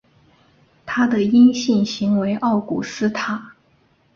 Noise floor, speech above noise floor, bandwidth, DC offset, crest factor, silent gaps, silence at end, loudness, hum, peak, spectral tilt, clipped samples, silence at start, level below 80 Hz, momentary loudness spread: -59 dBFS; 41 dB; 7.2 kHz; under 0.1%; 16 dB; none; 0.65 s; -19 LUFS; none; -4 dBFS; -5.5 dB/octave; under 0.1%; 0.85 s; -58 dBFS; 13 LU